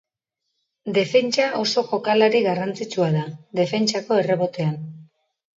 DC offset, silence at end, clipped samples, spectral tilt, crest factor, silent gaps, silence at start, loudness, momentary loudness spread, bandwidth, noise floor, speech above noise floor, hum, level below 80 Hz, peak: under 0.1%; 0.55 s; under 0.1%; -5 dB/octave; 18 dB; none; 0.85 s; -21 LUFS; 8 LU; 7.8 kHz; -80 dBFS; 59 dB; none; -70 dBFS; -4 dBFS